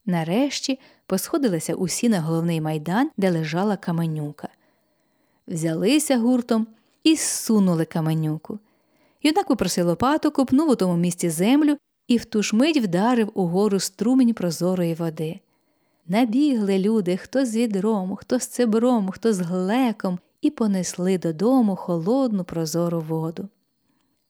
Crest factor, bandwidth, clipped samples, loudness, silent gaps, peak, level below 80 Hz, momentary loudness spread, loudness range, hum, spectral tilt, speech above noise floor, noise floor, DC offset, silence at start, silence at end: 16 dB; over 20 kHz; under 0.1%; -22 LUFS; none; -6 dBFS; -60 dBFS; 8 LU; 3 LU; none; -5.5 dB/octave; 47 dB; -69 dBFS; under 0.1%; 0.05 s; 0.85 s